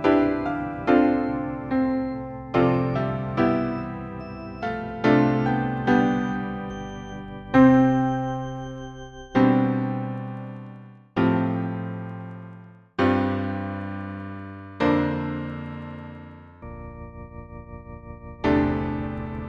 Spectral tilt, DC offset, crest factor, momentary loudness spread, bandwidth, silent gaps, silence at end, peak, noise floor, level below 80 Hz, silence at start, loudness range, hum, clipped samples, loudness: -8.5 dB/octave; under 0.1%; 20 dB; 21 LU; 6.6 kHz; none; 0 s; -6 dBFS; -45 dBFS; -44 dBFS; 0 s; 8 LU; none; under 0.1%; -24 LUFS